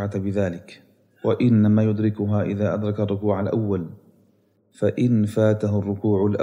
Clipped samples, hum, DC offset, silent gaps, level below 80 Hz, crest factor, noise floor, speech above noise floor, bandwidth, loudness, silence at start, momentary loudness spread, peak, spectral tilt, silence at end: under 0.1%; none; under 0.1%; none; -64 dBFS; 14 dB; -62 dBFS; 41 dB; 10.5 kHz; -22 LUFS; 0 s; 8 LU; -8 dBFS; -9.5 dB/octave; 0 s